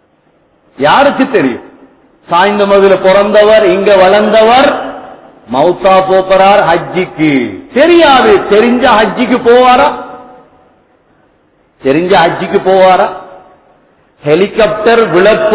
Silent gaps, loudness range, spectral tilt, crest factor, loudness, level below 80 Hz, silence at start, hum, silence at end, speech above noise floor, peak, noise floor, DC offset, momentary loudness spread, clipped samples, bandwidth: none; 4 LU; -9 dB/octave; 8 dB; -7 LUFS; -42 dBFS; 0.8 s; none; 0 s; 44 dB; 0 dBFS; -50 dBFS; under 0.1%; 10 LU; 3%; 4 kHz